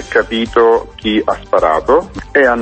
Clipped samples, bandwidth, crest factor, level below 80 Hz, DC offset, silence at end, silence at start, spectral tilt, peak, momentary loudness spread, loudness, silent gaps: under 0.1%; 8.6 kHz; 12 dB; -36 dBFS; under 0.1%; 0 s; 0 s; -5 dB/octave; 0 dBFS; 5 LU; -13 LUFS; none